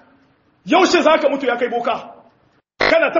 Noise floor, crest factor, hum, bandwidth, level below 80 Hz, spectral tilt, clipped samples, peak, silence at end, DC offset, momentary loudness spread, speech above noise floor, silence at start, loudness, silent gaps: -58 dBFS; 18 dB; none; 7.4 kHz; -54 dBFS; -1 dB/octave; under 0.1%; 0 dBFS; 0 s; under 0.1%; 9 LU; 43 dB; 0.65 s; -16 LUFS; none